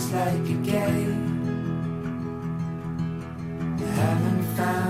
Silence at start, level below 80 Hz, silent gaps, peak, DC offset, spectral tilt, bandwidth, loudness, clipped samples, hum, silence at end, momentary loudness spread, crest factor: 0 s; -52 dBFS; none; -12 dBFS; under 0.1%; -7 dB/octave; 16 kHz; -27 LUFS; under 0.1%; none; 0 s; 8 LU; 14 dB